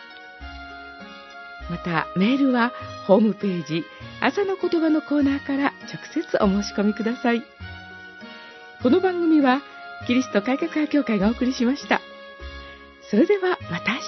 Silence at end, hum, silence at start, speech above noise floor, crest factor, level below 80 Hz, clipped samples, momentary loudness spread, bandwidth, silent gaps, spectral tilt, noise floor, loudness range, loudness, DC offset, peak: 0 s; none; 0 s; 21 dB; 22 dB; -50 dBFS; under 0.1%; 20 LU; 6.2 kHz; none; -6 dB/octave; -43 dBFS; 2 LU; -22 LUFS; under 0.1%; -2 dBFS